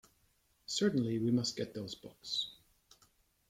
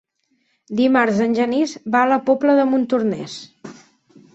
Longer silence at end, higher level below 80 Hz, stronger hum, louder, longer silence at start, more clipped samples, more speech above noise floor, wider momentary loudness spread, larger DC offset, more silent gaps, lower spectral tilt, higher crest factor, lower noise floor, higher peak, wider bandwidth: first, 0.95 s vs 0.65 s; second, -72 dBFS vs -64 dBFS; neither; second, -36 LUFS vs -18 LUFS; about the same, 0.7 s vs 0.7 s; neither; second, 38 dB vs 49 dB; about the same, 13 LU vs 13 LU; neither; neither; about the same, -5 dB/octave vs -5.5 dB/octave; about the same, 18 dB vs 16 dB; first, -73 dBFS vs -66 dBFS; second, -20 dBFS vs -4 dBFS; first, 15.5 kHz vs 8.2 kHz